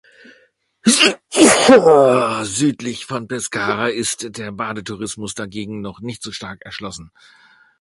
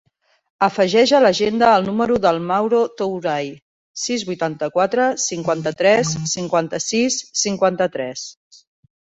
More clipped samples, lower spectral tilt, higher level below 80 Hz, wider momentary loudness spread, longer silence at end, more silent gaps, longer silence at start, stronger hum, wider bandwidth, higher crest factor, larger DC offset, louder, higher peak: neither; about the same, -3 dB/octave vs -3.5 dB/octave; about the same, -54 dBFS vs -58 dBFS; first, 20 LU vs 10 LU; second, 0.75 s vs 0.9 s; second, none vs 3.62-3.94 s; first, 0.85 s vs 0.6 s; neither; first, 12 kHz vs 8.2 kHz; about the same, 18 dB vs 16 dB; neither; about the same, -16 LUFS vs -18 LUFS; about the same, 0 dBFS vs -2 dBFS